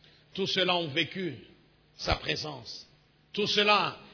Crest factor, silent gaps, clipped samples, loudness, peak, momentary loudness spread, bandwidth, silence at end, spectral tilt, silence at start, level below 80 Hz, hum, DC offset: 22 dB; none; under 0.1%; -28 LUFS; -10 dBFS; 18 LU; 5.4 kHz; 0 s; -4 dB/octave; 0.35 s; -50 dBFS; none; under 0.1%